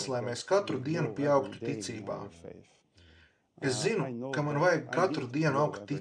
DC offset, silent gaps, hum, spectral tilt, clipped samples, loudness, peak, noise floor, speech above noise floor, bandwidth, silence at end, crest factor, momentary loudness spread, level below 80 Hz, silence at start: under 0.1%; none; none; -5.5 dB/octave; under 0.1%; -31 LUFS; -14 dBFS; -62 dBFS; 31 dB; 10.5 kHz; 0 s; 18 dB; 11 LU; -72 dBFS; 0 s